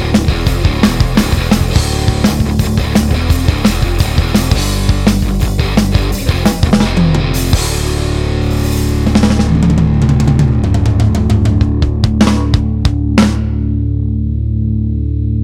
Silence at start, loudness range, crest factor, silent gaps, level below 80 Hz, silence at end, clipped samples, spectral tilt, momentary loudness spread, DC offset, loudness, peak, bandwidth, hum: 0 s; 2 LU; 12 dB; none; -16 dBFS; 0 s; under 0.1%; -6 dB/octave; 5 LU; under 0.1%; -13 LUFS; 0 dBFS; 16.5 kHz; none